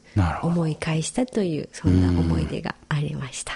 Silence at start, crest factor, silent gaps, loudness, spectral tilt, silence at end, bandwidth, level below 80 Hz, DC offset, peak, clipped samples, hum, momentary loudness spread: 0.15 s; 16 dB; none; -24 LUFS; -6 dB/octave; 0 s; 11.5 kHz; -38 dBFS; under 0.1%; -6 dBFS; under 0.1%; none; 8 LU